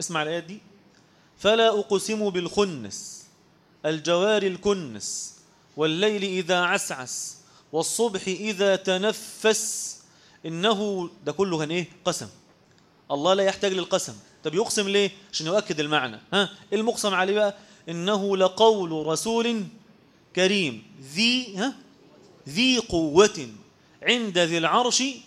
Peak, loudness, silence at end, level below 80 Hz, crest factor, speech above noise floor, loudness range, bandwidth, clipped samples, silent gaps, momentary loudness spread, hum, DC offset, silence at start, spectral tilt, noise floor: -4 dBFS; -24 LUFS; 0.05 s; -60 dBFS; 22 dB; 34 dB; 3 LU; 15 kHz; under 0.1%; none; 13 LU; none; under 0.1%; 0 s; -3 dB/octave; -59 dBFS